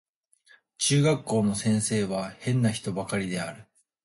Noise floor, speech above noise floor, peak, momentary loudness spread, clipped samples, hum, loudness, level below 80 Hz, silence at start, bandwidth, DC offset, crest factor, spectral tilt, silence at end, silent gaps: -61 dBFS; 35 dB; -12 dBFS; 9 LU; under 0.1%; none; -26 LUFS; -60 dBFS; 0.8 s; 11.5 kHz; under 0.1%; 16 dB; -5 dB/octave; 0.4 s; none